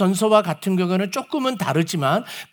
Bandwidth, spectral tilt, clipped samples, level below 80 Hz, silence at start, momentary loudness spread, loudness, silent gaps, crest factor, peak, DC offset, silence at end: over 20 kHz; -5.5 dB/octave; under 0.1%; -70 dBFS; 0 s; 7 LU; -21 LUFS; none; 18 dB; -2 dBFS; under 0.1%; 0.1 s